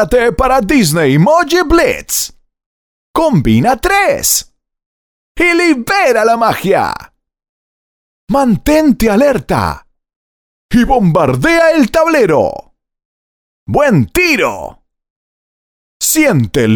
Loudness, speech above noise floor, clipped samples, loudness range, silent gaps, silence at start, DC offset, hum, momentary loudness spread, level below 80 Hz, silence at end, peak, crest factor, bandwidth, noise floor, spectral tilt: -11 LUFS; over 80 dB; under 0.1%; 2 LU; 2.66-3.14 s, 4.86-5.35 s, 7.49-8.27 s, 10.16-10.69 s, 13.05-13.66 s, 15.10-16.00 s; 0 s; under 0.1%; none; 7 LU; -32 dBFS; 0 s; 0 dBFS; 12 dB; over 20 kHz; under -90 dBFS; -4.5 dB/octave